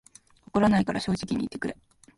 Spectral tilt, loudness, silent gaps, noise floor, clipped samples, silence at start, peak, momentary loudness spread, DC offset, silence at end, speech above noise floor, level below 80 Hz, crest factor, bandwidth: -6.5 dB/octave; -27 LUFS; none; -54 dBFS; under 0.1%; 0.55 s; -10 dBFS; 13 LU; under 0.1%; 0.45 s; 28 dB; -52 dBFS; 18 dB; 11.5 kHz